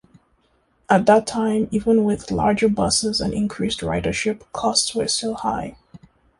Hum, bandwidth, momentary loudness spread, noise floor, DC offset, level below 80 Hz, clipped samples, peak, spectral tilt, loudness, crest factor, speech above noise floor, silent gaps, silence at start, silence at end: none; 11.5 kHz; 7 LU; -63 dBFS; under 0.1%; -44 dBFS; under 0.1%; -2 dBFS; -4 dB/octave; -20 LUFS; 18 dB; 43 dB; none; 0.9 s; 0.45 s